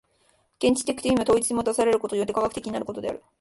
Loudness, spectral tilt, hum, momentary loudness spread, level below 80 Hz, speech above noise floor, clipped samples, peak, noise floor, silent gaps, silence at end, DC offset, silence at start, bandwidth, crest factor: -25 LUFS; -4 dB/octave; none; 10 LU; -54 dBFS; 41 dB; under 0.1%; -8 dBFS; -65 dBFS; none; 0.2 s; under 0.1%; 0.6 s; 12 kHz; 16 dB